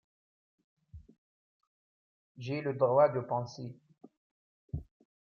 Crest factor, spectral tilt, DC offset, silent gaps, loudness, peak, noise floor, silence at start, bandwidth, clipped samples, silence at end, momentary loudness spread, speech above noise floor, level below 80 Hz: 22 dB; -7.5 dB/octave; under 0.1%; 1.18-1.60 s, 1.67-2.35 s, 4.17-4.68 s; -31 LUFS; -14 dBFS; under -90 dBFS; 0.95 s; 7 kHz; under 0.1%; 0.5 s; 20 LU; over 60 dB; -60 dBFS